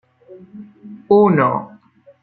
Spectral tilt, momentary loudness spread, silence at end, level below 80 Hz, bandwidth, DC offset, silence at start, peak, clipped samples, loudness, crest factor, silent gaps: -12 dB/octave; 26 LU; 0.55 s; -60 dBFS; 4.5 kHz; under 0.1%; 0.3 s; -2 dBFS; under 0.1%; -15 LUFS; 16 dB; none